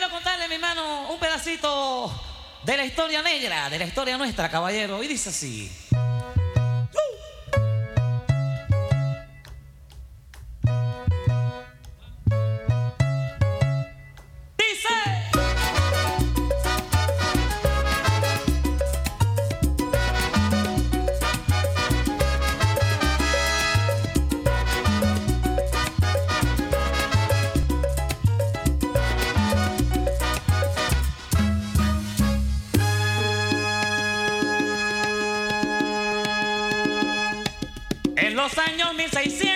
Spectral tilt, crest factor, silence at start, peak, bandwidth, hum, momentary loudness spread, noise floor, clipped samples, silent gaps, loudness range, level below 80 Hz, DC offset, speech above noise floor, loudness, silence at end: -4.5 dB/octave; 16 dB; 0 s; -6 dBFS; 17 kHz; none; 5 LU; -44 dBFS; under 0.1%; none; 4 LU; -30 dBFS; under 0.1%; 17 dB; -24 LUFS; 0 s